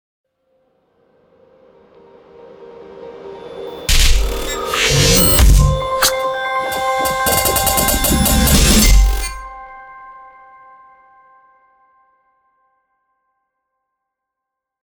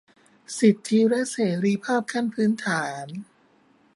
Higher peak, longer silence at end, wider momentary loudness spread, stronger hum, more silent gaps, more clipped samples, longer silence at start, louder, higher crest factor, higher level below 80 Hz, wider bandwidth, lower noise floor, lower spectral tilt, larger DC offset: first, 0 dBFS vs -6 dBFS; first, 4.75 s vs 0.75 s; first, 24 LU vs 15 LU; neither; neither; neither; first, 2.6 s vs 0.5 s; first, -14 LUFS vs -23 LUFS; about the same, 18 dB vs 18 dB; first, -20 dBFS vs -72 dBFS; first, over 20 kHz vs 11.5 kHz; first, -81 dBFS vs -60 dBFS; second, -3 dB/octave vs -5.5 dB/octave; neither